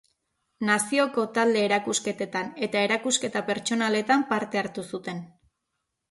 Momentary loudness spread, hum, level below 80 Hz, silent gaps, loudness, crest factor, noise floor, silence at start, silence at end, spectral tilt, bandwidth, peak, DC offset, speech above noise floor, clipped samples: 10 LU; none; -72 dBFS; none; -25 LUFS; 18 dB; -81 dBFS; 0.6 s; 0.85 s; -3 dB/octave; 12 kHz; -8 dBFS; under 0.1%; 55 dB; under 0.1%